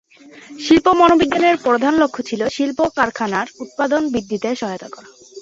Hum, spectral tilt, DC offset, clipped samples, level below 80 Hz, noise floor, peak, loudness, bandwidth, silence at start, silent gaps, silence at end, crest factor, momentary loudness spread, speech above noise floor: none; -4.5 dB/octave; under 0.1%; under 0.1%; -50 dBFS; -41 dBFS; -2 dBFS; -17 LUFS; 7.8 kHz; 0.35 s; none; 0 s; 16 dB; 13 LU; 25 dB